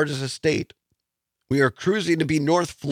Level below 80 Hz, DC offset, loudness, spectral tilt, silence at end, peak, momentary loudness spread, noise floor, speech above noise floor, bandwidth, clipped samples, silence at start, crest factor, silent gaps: -58 dBFS; under 0.1%; -23 LUFS; -5.5 dB/octave; 0 s; -6 dBFS; 6 LU; -82 dBFS; 59 dB; 15 kHz; under 0.1%; 0 s; 16 dB; none